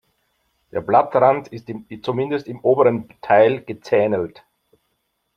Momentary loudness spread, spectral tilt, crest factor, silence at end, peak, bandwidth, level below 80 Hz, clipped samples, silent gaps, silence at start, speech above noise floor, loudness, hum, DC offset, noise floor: 15 LU; -8 dB/octave; 18 dB; 1.1 s; -2 dBFS; 6.6 kHz; -62 dBFS; under 0.1%; none; 0.75 s; 53 dB; -19 LUFS; none; under 0.1%; -72 dBFS